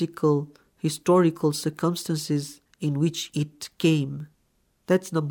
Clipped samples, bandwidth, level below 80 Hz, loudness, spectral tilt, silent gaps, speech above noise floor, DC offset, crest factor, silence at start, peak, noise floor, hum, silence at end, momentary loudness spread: under 0.1%; 19.5 kHz; -68 dBFS; -25 LUFS; -6 dB/octave; none; 44 dB; under 0.1%; 18 dB; 0 s; -8 dBFS; -68 dBFS; none; 0 s; 12 LU